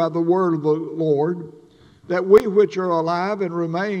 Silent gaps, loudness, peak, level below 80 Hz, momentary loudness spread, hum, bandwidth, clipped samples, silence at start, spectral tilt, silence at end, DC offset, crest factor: none; -20 LUFS; -2 dBFS; -60 dBFS; 10 LU; none; 9.8 kHz; under 0.1%; 0 s; -8 dB/octave; 0 s; under 0.1%; 18 dB